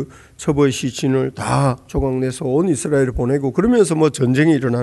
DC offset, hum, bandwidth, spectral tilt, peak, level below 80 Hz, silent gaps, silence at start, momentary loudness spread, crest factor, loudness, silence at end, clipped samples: under 0.1%; none; 12 kHz; -6.5 dB/octave; -2 dBFS; -36 dBFS; none; 0 s; 6 LU; 14 dB; -17 LUFS; 0 s; under 0.1%